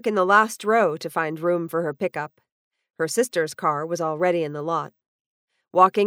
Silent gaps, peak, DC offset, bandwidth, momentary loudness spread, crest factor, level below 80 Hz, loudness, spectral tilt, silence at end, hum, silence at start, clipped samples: 2.52-2.71 s, 5.08-5.48 s; -4 dBFS; under 0.1%; over 20 kHz; 10 LU; 20 dB; -76 dBFS; -23 LUFS; -4.5 dB/octave; 0 s; none; 0.05 s; under 0.1%